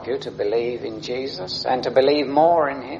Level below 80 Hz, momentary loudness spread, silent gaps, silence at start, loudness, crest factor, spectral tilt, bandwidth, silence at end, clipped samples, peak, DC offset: -58 dBFS; 11 LU; none; 0 s; -21 LUFS; 16 dB; -5.5 dB/octave; 7.6 kHz; 0 s; under 0.1%; -4 dBFS; under 0.1%